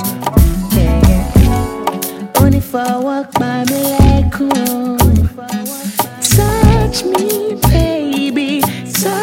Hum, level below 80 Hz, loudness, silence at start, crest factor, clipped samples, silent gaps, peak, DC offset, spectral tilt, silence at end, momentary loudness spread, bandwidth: none; -18 dBFS; -13 LUFS; 0 s; 12 dB; 0.2%; none; 0 dBFS; under 0.1%; -5.5 dB/octave; 0 s; 8 LU; 17 kHz